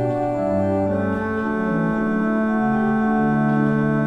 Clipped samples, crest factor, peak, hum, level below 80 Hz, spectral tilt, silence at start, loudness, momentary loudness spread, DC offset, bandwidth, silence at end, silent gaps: under 0.1%; 12 dB; -8 dBFS; none; -48 dBFS; -9.5 dB/octave; 0 s; -20 LUFS; 3 LU; under 0.1%; 6 kHz; 0 s; none